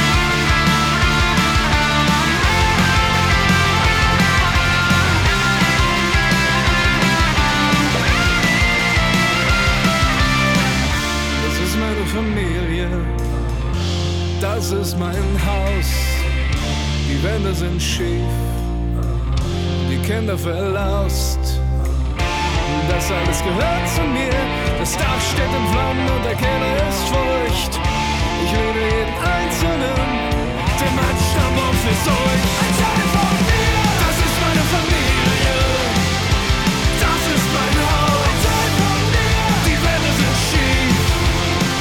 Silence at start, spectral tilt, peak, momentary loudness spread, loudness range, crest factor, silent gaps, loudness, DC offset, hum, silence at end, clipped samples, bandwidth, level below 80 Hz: 0 s; -4.5 dB/octave; -4 dBFS; 6 LU; 6 LU; 12 dB; none; -17 LUFS; under 0.1%; none; 0 s; under 0.1%; 18 kHz; -24 dBFS